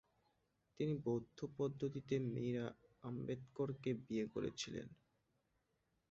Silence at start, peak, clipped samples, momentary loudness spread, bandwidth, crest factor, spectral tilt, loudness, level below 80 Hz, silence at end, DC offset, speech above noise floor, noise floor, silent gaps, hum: 0.8 s; -28 dBFS; under 0.1%; 9 LU; 7.6 kHz; 18 dB; -7 dB/octave; -44 LUFS; -74 dBFS; 1.15 s; under 0.1%; 41 dB; -84 dBFS; none; none